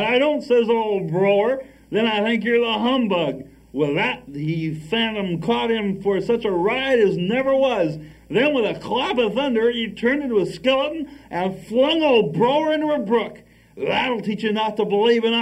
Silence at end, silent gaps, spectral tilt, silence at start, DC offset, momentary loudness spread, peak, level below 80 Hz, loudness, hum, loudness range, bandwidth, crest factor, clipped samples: 0 s; none; -6.5 dB/octave; 0 s; under 0.1%; 8 LU; -6 dBFS; -54 dBFS; -20 LUFS; none; 2 LU; 11 kHz; 14 dB; under 0.1%